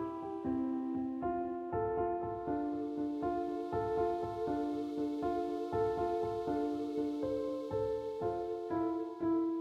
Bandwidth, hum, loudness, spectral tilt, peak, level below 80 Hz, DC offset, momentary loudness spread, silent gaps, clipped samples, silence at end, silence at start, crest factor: 9.4 kHz; none; -37 LUFS; -8.5 dB/octave; -22 dBFS; -60 dBFS; under 0.1%; 3 LU; none; under 0.1%; 0 s; 0 s; 14 dB